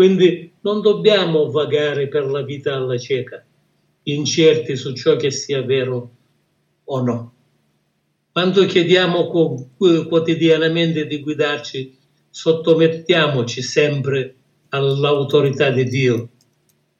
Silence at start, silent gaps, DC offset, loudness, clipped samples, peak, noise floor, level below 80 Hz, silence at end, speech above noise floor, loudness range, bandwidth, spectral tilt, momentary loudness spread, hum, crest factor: 0 s; none; under 0.1%; -17 LUFS; under 0.1%; 0 dBFS; -67 dBFS; -68 dBFS; 0.7 s; 50 dB; 5 LU; 7.6 kHz; -5.5 dB/octave; 11 LU; none; 18 dB